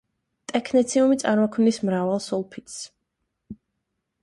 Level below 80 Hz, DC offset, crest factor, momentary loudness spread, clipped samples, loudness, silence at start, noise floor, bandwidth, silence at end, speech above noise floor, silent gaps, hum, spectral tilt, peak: -64 dBFS; under 0.1%; 18 dB; 17 LU; under 0.1%; -22 LUFS; 0.5 s; -79 dBFS; 11.5 kHz; 0.7 s; 57 dB; none; none; -5 dB/octave; -6 dBFS